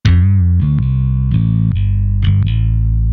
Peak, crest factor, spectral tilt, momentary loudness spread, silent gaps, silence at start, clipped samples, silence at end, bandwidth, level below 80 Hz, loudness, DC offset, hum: 0 dBFS; 12 dB; -8.5 dB/octave; 4 LU; none; 0.05 s; under 0.1%; 0 s; 6.2 kHz; -18 dBFS; -14 LUFS; under 0.1%; none